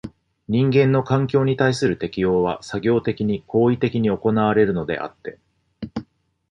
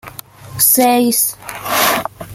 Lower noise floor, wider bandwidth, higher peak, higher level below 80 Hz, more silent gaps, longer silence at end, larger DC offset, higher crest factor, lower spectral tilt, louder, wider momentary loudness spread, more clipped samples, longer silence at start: first, -49 dBFS vs -34 dBFS; second, 10.5 kHz vs 17 kHz; second, -4 dBFS vs 0 dBFS; about the same, -50 dBFS vs -50 dBFS; neither; first, 0.5 s vs 0 s; neither; about the same, 18 dB vs 16 dB; first, -7.5 dB/octave vs -2 dB/octave; second, -20 LUFS vs -13 LUFS; second, 15 LU vs 22 LU; neither; about the same, 0.05 s vs 0.05 s